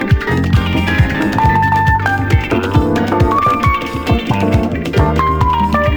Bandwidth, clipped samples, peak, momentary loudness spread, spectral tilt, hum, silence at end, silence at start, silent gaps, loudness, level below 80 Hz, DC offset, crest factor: over 20 kHz; under 0.1%; 0 dBFS; 3 LU; -7 dB/octave; none; 0 s; 0 s; none; -14 LUFS; -22 dBFS; under 0.1%; 12 dB